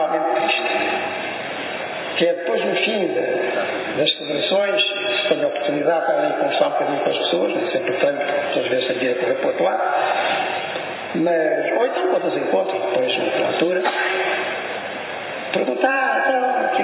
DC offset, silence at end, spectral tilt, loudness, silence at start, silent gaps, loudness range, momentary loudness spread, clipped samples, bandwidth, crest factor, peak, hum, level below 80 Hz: under 0.1%; 0 s; -8 dB/octave; -20 LUFS; 0 s; none; 2 LU; 7 LU; under 0.1%; 4 kHz; 18 dB; -2 dBFS; none; -70 dBFS